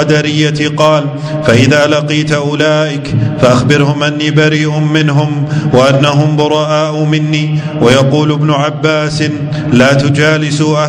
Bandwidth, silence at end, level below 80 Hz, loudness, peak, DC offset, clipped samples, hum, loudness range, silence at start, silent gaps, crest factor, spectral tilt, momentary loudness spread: 10 kHz; 0 s; -40 dBFS; -10 LUFS; 0 dBFS; under 0.1%; 1%; none; 1 LU; 0 s; none; 10 dB; -6 dB/octave; 6 LU